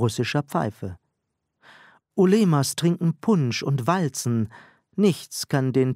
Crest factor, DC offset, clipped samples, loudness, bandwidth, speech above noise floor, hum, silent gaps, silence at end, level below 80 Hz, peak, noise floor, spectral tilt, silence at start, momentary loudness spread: 18 dB; under 0.1%; under 0.1%; -23 LUFS; 16 kHz; 56 dB; none; none; 0 s; -64 dBFS; -6 dBFS; -78 dBFS; -6 dB/octave; 0 s; 12 LU